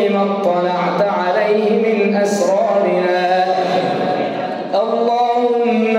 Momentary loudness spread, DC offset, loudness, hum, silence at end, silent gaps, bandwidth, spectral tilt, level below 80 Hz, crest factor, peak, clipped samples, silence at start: 4 LU; under 0.1%; -16 LUFS; none; 0 s; none; 15 kHz; -5.5 dB/octave; -70 dBFS; 12 dB; -2 dBFS; under 0.1%; 0 s